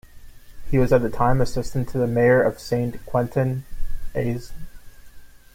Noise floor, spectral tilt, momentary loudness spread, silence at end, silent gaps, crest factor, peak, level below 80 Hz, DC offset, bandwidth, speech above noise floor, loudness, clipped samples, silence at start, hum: -41 dBFS; -7.5 dB/octave; 14 LU; 0.25 s; none; 16 dB; -6 dBFS; -34 dBFS; under 0.1%; 16 kHz; 21 dB; -22 LUFS; under 0.1%; 0.15 s; none